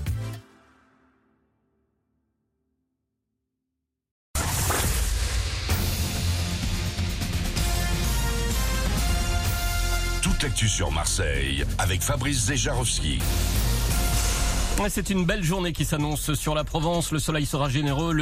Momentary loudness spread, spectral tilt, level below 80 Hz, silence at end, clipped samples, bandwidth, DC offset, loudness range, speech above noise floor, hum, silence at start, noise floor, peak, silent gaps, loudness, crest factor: 4 LU; -4 dB/octave; -30 dBFS; 0 s; under 0.1%; 16 kHz; under 0.1%; 5 LU; 58 dB; none; 0 s; -83 dBFS; -10 dBFS; 4.11-4.34 s; -25 LUFS; 14 dB